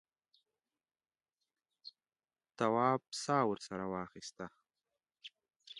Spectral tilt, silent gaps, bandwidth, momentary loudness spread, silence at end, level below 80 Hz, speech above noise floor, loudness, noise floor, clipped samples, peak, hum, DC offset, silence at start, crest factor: -5 dB/octave; 5.56-5.60 s; 11 kHz; 23 LU; 0 s; -78 dBFS; over 54 dB; -36 LUFS; under -90 dBFS; under 0.1%; -16 dBFS; none; under 0.1%; 1.85 s; 24 dB